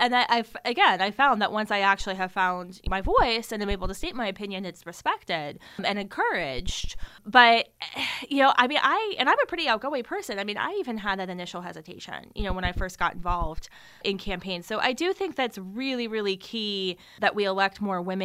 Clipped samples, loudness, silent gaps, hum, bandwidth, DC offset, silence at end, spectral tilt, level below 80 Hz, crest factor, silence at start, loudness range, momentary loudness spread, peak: under 0.1%; -26 LUFS; none; none; 16 kHz; under 0.1%; 0 s; -4 dB/octave; -40 dBFS; 24 dB; 0 s; 9 LU; 13 LU; -2 dBFS